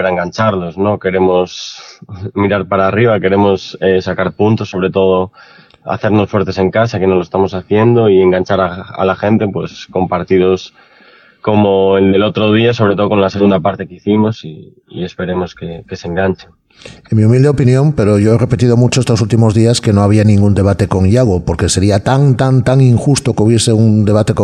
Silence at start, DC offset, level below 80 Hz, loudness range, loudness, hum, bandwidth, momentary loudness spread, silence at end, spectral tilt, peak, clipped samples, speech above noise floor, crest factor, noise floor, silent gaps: 0 s; under 0.1%; -40 dBFS; 5 LU; -12 LUFS; none; 11.5 kHz; 11 LU; 0 s; -6.5 dB/octave; 0 dBFS; under 0.1%; 33 dB; 12 dB; -44 dBFS; none